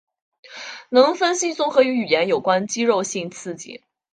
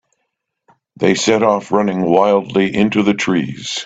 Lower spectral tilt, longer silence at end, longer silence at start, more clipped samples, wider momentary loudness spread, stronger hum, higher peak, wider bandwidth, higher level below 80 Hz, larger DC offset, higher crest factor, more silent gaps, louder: second, -3 dB/octave vs -5 dB/octave; first, 0.35 s vs 0 s; second, 0.5 s vs 1 s; neither; first, 18 LU vs 5 LU; neither; about the same, -2 dBFS vs 0 dBFS; first, 10 kHz vs 9 kHz; second, -70 dBFS vs -54 dBFS; neither; about the same, 18 dB vs 16 dB; neither; second, -19 LUFS vs -15 LUFS